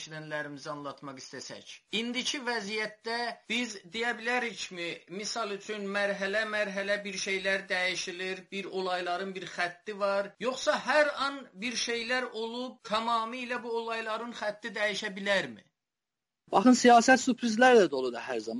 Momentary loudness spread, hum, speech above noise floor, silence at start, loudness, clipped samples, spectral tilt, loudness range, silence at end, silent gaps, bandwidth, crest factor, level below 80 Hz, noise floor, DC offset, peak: 14 LU; none; over 60 dB; 0 s; -30 LUFS; under 0.1%; -3 dB/octave; 8 LU; 0 s; none; 11.5 kHz; 20 dB; -74 dBFS; under -90 dBFS; under 0.1%; -10 dBFS